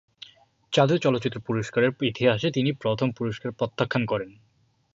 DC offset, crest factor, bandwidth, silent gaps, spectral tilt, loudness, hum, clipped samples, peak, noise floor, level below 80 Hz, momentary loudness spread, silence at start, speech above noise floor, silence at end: under 0.1%; 20 dB; 7.8 kHz; none; -6.5 dB/octave; -25 LUFS; none; under 0.1%; -6 dBFS; -52 dBFS; -60 dBFS; 9 LU; 0.7 s; 27 dB; 0.65 s